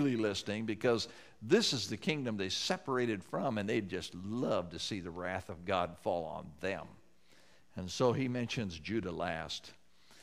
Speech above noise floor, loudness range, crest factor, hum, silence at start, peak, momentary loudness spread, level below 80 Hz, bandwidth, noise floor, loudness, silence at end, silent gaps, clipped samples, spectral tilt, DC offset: 31 dB; 4 LU; 20 dB; none; 0 s; -16 dBFS; 10 LU; -66 dBFS; 15 kHz; -66 dBFS; -36 LUFS; 0.1 s; none; under 0.1%; -4.5 dB/octave; under 0.1%